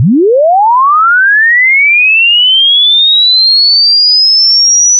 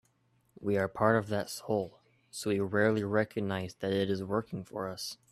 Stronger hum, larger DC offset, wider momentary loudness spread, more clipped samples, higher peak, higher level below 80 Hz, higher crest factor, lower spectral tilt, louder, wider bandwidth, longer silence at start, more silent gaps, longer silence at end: neither; neither; second, 4 LU vs 11 LU; neither; first, -4 dBFS vs -10 dBFS; about the same, -70 dBFS vs -68 dBFS; second, 4 dB vs 22 dB; second, 0.5 dB/octave vs -5.5 dB/octave; first, -4 LUFS vs -32 LUFS; second, 6.4 kHz vs 14.5 kHz; second, 0 s vs 0.6 s; neither; second, 0 s vs 0.15 s